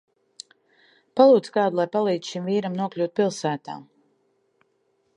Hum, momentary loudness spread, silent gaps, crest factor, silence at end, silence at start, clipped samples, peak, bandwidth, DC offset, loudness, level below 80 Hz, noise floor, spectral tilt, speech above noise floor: none; 26 LU; none; 22 dB; 1.35 s; 1.15 s; under 0.1%; -2 dBFS; 11 kHz; under 0.1%; -22 LUFS; -78 dBFS; -69 dBFS; -6 dB/octave; 47 dB